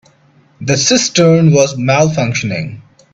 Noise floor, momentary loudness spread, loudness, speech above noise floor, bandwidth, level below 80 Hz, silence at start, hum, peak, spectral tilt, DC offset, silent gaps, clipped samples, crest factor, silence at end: -49 dBFS; 12 LU; -12 LUFS; 38 dB; 8 kHz; -48 dBFS; 0.6 s; none; 0 dBFS; -4.5 dB/octave; under 0.1%; none; under 0.1%; 12 dB; 0.3 s